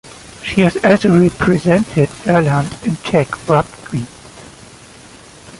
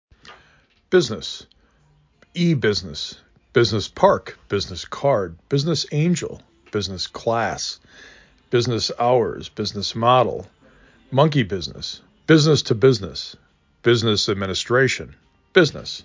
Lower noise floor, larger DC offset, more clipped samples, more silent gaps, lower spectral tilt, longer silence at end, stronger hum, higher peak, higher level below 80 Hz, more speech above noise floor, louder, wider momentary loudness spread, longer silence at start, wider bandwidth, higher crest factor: second, -39 dBFS vs -58 dBFS; neither; neither; neither; first, -7 dB/octave vs -5 dB/octave; about the same, 0.05 s vs 0.05 s; neither; about the same, 0 dBFS vs -2 dBFS; first, -42 dBFS vs -48 dBFS; second, 26 dB vs 38 dB; first, -15 LUFS vs -20 LUFS; about the same, 13 LU vs 14 LU; second, 0.05 s vs 0.25 s; first, 11.5 kHz vs 7.6 kHz; second, 14 dB vs 20 dB